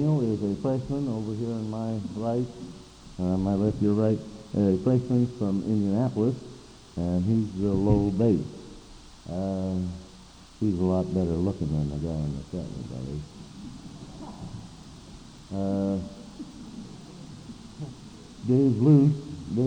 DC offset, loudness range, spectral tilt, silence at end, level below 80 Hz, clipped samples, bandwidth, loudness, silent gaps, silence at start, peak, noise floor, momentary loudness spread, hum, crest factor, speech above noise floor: under 0.1%; 9 LU; -9 dB/octave; 0 s; -48 dBFS; under 0.1%; 9.8 kHz; -27 LUFS; none; 0 s; -6 dBFS; -49 dBFS; 21 LU; none; 20 dB; 24 dB